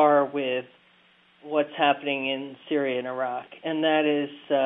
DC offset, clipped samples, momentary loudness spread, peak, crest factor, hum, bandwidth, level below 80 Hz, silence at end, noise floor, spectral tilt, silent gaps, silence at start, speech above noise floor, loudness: under 0.1%; under 0.1%; 9 LU; -8 dBFS; 18 dB; none; 3.9 kHz; -82 dBFS; 0 s; -60 dBFS; -8.5 dB/octave; none; 0 s; 34 dB; -26 LUFS